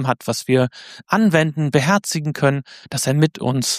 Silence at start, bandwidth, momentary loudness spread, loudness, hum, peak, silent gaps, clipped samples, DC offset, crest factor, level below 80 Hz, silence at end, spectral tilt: 0 s; 15.5 kHz; 8 LU; -19 LUFS; none; -2 dBFS; none; under 0.1%; under 0.1%; 18 dB; -58 dBFS; 0 s; -5 dB/octave